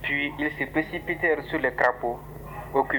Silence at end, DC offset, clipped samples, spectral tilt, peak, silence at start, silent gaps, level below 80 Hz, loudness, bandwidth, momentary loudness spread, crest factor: 0 s; under 0.1%; under 0.1%; -6.5 dB/octave; -8 dBFS; 0 s; none; -48 dBFS; -26 LUFS; over 20 kHz; 11 LU; 20 dB